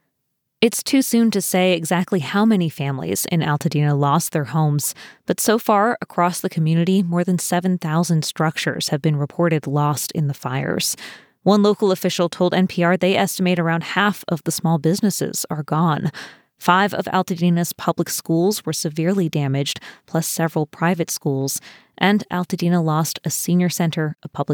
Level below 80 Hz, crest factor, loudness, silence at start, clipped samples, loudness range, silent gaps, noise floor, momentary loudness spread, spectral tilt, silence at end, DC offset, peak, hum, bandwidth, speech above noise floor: -66 dBFS; 18 dB; -20 LUFS; 0.6 s; under 0.1%; 3 LU; none; -74 dBFS; 6 LU; -5 dB/octave; 0 s; under 0.1%; 0 dBFS; none; over 20 kHz; 55 dB